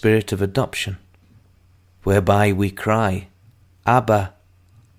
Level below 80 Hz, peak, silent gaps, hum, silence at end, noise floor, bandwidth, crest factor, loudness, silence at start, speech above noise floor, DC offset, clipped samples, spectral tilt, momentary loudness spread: -46 dBFS; -2 dBFS; none; none; 0.7 s; -54 dBFS; 16 kHz; 20 dB; -20 LUFS; 0.05 s; 36 dB; under 0.1%; under 0.1%; -6.5 dB/octave; 12 LU